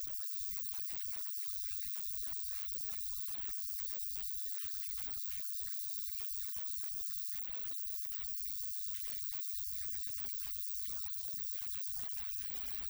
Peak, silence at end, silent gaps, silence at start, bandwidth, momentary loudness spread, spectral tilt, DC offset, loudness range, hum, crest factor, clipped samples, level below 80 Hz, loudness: -22 dBFS; 0 s; none; 0 s; over 20 kHz; 1 LU; -0.5 dB/octave; under 0.1%; 0 LU; none; 18 dB; under 0.1%; -64 dBFS; -37 LUFS